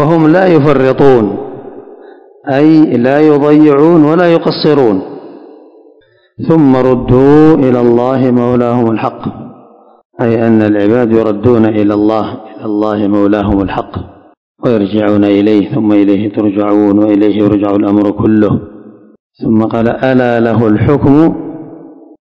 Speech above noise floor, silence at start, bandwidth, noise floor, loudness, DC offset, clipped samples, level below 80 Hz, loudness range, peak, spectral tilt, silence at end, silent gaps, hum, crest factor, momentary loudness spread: 38 dB; 0 s; 6.2 kHz; -46 dBFS; -9 LUFS; under 0.1%; 3%; -36 dBFS; 3 LU; 0 dBFS; -9.5 dB/octave; 0.3 s; 10.05-10.10 s, 14.37-14.55 s, 19.20-19.30 s; none; 10 dB; 13 LU